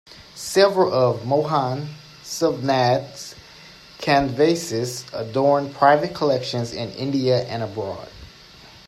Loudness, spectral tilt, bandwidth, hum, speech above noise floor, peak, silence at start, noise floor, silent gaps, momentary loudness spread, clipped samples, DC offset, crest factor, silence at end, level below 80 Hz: -21 LUFS; -5 dB/octave; 13.5 kHz; none; 25 dB; -2 dBFS; 0.1 s; -46 dBFS; none; 18 LU; under 0.1%; under 0.1%; 18 dB; 0.15 s; -54 dBFS